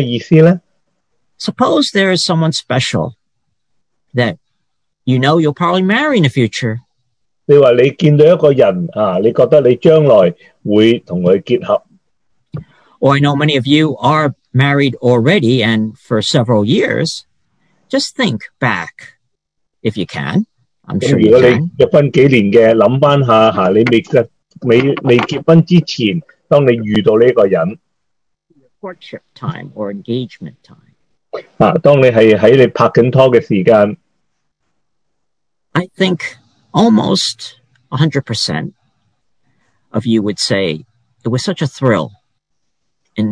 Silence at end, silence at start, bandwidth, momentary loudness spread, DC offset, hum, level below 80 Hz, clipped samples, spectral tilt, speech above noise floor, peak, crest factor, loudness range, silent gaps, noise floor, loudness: 0 s; 0 s; 11 kHz; 16 LU; under 0.1%; none; -52 dBFS; 0.5%; -6.5 dB/octave; 65 dB; 0 dBFS; 12 dB; 9 LU; none; -76 dBFS; -12 LUFS